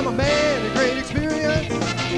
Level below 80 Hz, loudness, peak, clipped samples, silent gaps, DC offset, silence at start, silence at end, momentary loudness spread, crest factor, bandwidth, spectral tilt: -38 dBFS; -21 LUFS; -6 dBFS; under 0.1%; none; 0.4%; 0 s; 0 s; 5 LU; 14 dB; 11 kHz; -5 dB/octave